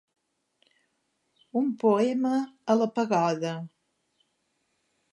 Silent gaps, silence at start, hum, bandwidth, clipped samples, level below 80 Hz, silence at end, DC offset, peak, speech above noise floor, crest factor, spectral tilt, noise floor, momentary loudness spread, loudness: none; 1.55 s; none; 11 kHz; under 0.1%; -82 dBFS; 1.45 s; under 0.1%; -10 dBFS; 50 dB; 20 dB; -6.5 dB/octave; -76 dBFS; 10 LU; -26 LUFS